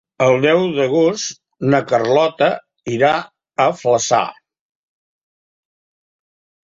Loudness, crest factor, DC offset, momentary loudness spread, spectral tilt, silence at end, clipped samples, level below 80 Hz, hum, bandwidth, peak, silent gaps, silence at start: -16 LUFS; 16 dB; under 0.1%; 11 LU; -4.5 dB/octave; 2.35 s; under 0.1%; -60 dBFS; none; 7.8 kHz; -2 dBFS; none; 0.2 s